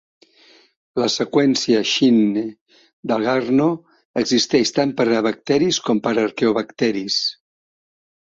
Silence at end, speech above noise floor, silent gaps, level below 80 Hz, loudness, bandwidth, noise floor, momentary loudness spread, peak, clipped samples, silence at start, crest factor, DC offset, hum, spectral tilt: 0.95 s; 34 dB; 2.61-2.66 s, 2.93-3.03 s, 4.05-4.14 s; -60 dBFS; -19 LUFS; 7.8 kHz; -52 dBFS; 8 LU; -2 dBFS; under 0.1%; 0.95 s; 16 dB; under 0.1%; none; -4 dB/octave